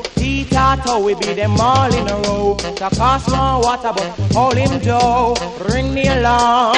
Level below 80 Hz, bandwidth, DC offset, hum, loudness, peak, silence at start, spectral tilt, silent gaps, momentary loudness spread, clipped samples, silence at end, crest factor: -28 dBFS; 11 kHz; under 0.1%; none; -15 LUFS; -2 dBFS; 0 s; -5 dB/octave; none; 6 LU; under 0.1%; 0 s; 14 dB